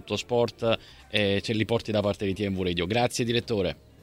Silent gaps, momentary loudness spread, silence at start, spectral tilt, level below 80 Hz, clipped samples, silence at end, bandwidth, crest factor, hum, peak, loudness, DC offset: none; 4 LU; 0.05 s; -5 dB/octave; -52 dBFS; under 0.1%; 0.3 s; 16 kHz; 20 dB; none; -6 dBFS; -27 LUFS; under 0.1%